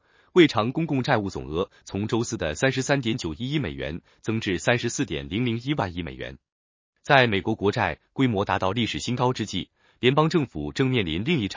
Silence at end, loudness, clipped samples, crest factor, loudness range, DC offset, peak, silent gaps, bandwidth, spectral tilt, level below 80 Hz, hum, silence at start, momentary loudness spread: 0 s; -25 LUFS; under 0.1%; 24 dB; 3 LU; under 0.1%; -2 dBFS; 6.52-6.93 s; 7.6 kHz; -5.5 dB/octave; -48 dBFS; none; 0.35 s; 12 LU